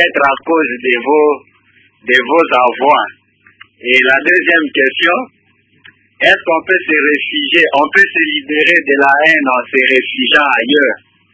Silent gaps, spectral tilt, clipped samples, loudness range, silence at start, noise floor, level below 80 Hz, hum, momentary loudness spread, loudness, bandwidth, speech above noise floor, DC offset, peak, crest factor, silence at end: none; -4 dB/octave; 0.3%; 3 LU; 0 s; -53 dBFS; -58 dBFS; none; 5 LU; -10 LUFS; 8 kHz; 42 dB; under 0.1%; 0 dBFS; 12 dB; 0.35 s